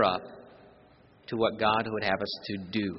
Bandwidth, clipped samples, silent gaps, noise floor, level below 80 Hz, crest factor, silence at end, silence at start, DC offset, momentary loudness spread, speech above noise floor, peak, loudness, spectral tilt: 6 kHz; under 0.1%; none; -58 dBFS; -62 dBFS; 20 dB; 0 s; 0 s; under 0.1%; 21 LU; 29 dB; -10 dBFS; -30 LUFS; -3 dB/octave